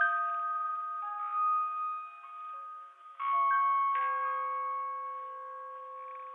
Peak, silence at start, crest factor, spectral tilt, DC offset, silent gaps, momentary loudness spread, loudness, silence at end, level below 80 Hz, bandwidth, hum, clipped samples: -16 dBFS; 0 s; 16 dB; 1 dB/octave; under 0.1%; none; 16 LU; -32 LUFS; 0 s; under -90 dBFS; 3.9 kHz; none; under 0.1%